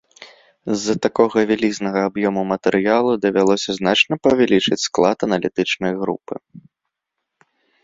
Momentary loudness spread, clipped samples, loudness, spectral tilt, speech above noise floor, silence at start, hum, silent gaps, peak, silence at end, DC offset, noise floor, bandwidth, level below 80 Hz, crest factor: 9 LU; under 0.1%; -18 LUFS; -4.5 dB/octave; 61 dB; 0.2 s; none; none; -2 dBFS; 1.25 s; under 0.1%; -79 dBFS; 7.8 kHz; -56 dBFS; 18 dB